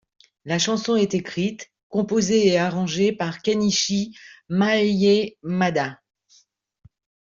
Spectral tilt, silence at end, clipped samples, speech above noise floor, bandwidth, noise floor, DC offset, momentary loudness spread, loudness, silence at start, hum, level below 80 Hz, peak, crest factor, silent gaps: -4.5 dB/octave; 1.35 s; under 0.1%; 38 dB; 7.6 kHz; -60 dBFS; under 0.1%; 9 LU; -22 LUFS; 0.45 s; none; -60 dBFS; -6 dBFS; 18 dB; 1.83-1.90 s